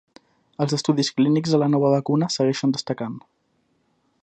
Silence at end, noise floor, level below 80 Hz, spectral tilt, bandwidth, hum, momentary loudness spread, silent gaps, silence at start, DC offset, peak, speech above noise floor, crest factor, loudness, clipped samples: 1.05 s; -68 dBFS; -68 dBFS; -6 dB/octave; 9 kHz; none; 10 LU; none; 0.6 s; under 0.1%; -6 dBFS; 47 dB; 16 dB; -21 LUFS; under 0.1%